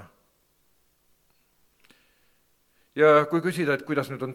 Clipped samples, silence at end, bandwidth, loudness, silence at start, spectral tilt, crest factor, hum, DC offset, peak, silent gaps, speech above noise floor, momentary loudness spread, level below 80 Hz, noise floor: under 0.1%; 0 s; 15.5 kHz; -23 LUFS; 0 s; -6.5 dB/octave; 22 dB; 60 Hz at -70 dBFS; under 0.1%; -6 dBFS; none; 45 dB; 10 LU; -74 dBFS; -67 dBFS